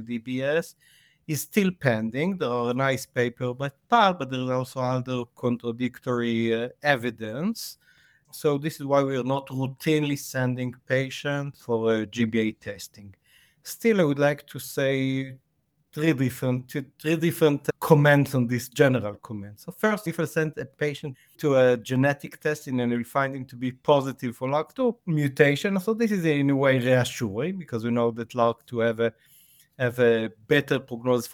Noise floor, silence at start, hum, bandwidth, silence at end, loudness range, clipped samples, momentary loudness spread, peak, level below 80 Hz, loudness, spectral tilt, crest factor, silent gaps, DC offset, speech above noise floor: -72 dBFS; 0 s; none; 20 kHz; 0 s; 4 LU; under 0.1%; 10 LU; -2 dBFS; -66 dBFS; -25 LUFS; -6 dB/octave; 22 dB; none; under 0.1%; 47 dB